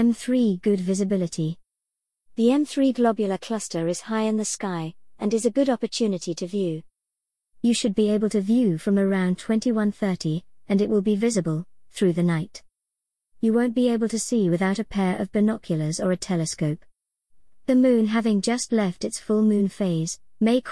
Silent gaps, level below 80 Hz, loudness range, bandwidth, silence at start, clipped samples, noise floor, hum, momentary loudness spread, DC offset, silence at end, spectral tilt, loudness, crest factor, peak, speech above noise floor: none; -60 dBFS; 3 LU; 12 kHz; 0 s; under 0.1%; -85 dBFS; none; 8 LU; 0.2%; 0 s; -6 dB/octave; -23 LUFS; 14 dB; -8 dBFS; 63 dB